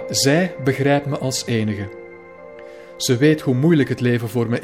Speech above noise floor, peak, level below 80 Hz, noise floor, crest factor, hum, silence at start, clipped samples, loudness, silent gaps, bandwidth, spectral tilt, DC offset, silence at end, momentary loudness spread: 21 dB; -4 dBFS; -58 dBFS; -39 dBFS; 16 dB; none; 0 s; under 0.1%; -19 LUFS; none; 16.5 kHz; -5 dB/octave; 0.1%; 0 s; 22 LU